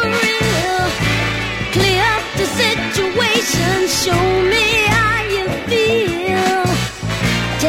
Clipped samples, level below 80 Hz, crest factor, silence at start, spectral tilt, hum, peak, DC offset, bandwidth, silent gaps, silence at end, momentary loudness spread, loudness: under 0.1%; -34 dBFS; 14 dB; 0 s; -4 dB/octave; none; 0 dBFS; under 0.1%; 16.5 kHz; none; 0 s; 6 LU; -15 LUFS